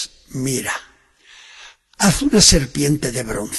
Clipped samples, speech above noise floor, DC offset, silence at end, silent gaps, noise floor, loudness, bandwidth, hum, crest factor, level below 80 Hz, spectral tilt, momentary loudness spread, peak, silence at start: under 0.1%; 33 dB; under 0.1%; 0 s; none; -50 dBFS; -16 LUFS; 13 kHz; none; 20 dB; -34 dBFS; -3 dB/octave; 15 LU; 0 dBFS; 0 s